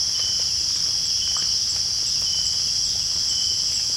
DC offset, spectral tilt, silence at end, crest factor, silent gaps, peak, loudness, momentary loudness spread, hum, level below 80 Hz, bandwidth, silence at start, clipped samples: under 0.1%; 1 dB/octave; 0 s; 14 dB; none; -10 dBFS; -19 LUFS; 1 LU; none; -48 dBFS; 16.5 kHz; 0 s; under 0.1%